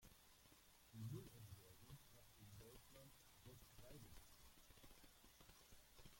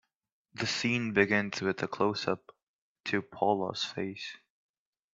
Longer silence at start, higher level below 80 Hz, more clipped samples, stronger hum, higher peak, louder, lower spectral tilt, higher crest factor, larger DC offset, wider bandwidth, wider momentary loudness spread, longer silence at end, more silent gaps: second, 0 s vs 0.55 s; about the same, -74 dBFS vs -72 dBFS; neither; neither; second, -42 dBFS vs -8 dBFS; second, -64 LUFS vs -31 LUFS; about the same, -4.5 dB/octave vs -4.5 dB/octave; about the same, 20 dB vs 24 dB; neither; first, 16.5 kHz vs 8 kHz; about the same, 11 LU vs 12 LU; second, 0 s vs 0.8 s; second, none vs 2.63-3.04 s